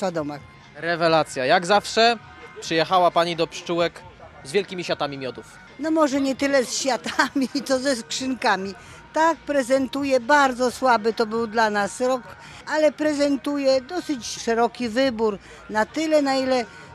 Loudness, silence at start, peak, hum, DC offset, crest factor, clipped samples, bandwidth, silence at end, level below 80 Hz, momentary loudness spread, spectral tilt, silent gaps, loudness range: -22 LUFS; 0 s; -2 dBFS; none; under 0.1%; 20 dB; under 0.1%; 14 kHz; 0 s; -58 dBFS; 11 LU; -3.5 dB/octave; none; 3 LU